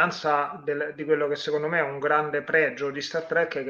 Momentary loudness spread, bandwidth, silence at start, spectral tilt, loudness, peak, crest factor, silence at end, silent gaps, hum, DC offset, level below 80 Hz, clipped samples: 7 LU; 7.4 kHz; 0 s; -5 dB/octave; -25 LUFS; -8 dBFS; 18 dB; 0 s; none; none; under 0.1%; -74 dBFS; under 0.1%